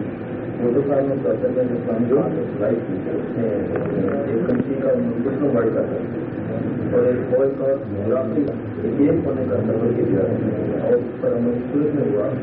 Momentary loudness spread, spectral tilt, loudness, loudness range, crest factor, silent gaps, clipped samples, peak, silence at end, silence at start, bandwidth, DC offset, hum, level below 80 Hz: 6 LU; -9.5 dB/octave; -21 LUFS; 1 LU; 14 dB; none; under 0.1%; -6 dBFS; 0 s; 0 s; 4.1 kHz; under 0.1%; none; -52 dBFS